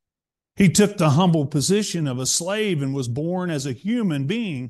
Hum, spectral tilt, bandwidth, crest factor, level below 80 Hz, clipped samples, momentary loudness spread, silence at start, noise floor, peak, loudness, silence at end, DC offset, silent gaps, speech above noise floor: none; -5 dB/octave; 12.5 kHz; 16 dB; -54 dBFS; under 0.1%; 8 LU; 0.55 s; -89 dBFS; -6 dBFS; -21 LUFS; 0 s; under 0.1%; none; 69 dB